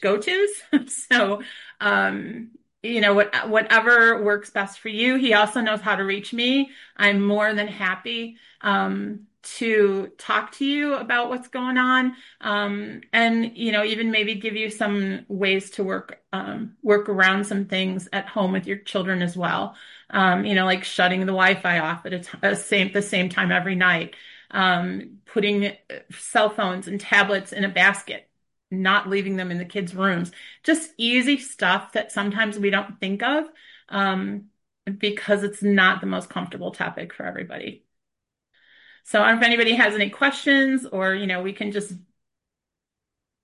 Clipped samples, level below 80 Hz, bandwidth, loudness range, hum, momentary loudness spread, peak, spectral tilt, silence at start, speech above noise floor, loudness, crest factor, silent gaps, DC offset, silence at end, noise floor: under 0.1%; -70 dBFS; 11.5 kHz; 5 LU; none; 14 LU; -4 dBFS; -4.5 dB/octave; 0 s; 64 dB; -21 LUFS; 18 dB; none; under 0.1%; 1.45 s; -86 dBFS